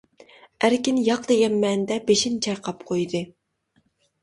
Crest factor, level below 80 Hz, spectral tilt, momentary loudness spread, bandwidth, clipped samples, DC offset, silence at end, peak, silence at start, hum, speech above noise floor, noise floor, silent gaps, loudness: 18 dB; -62 dBFS; -4 dB/octave; 8 LU; 11.5 kHz; under 0.1%; under 0.1%; 0.95 s; -6 dBFS; 0.6 s; none; 46 dB; -68 dBFS; none; -22 LUFS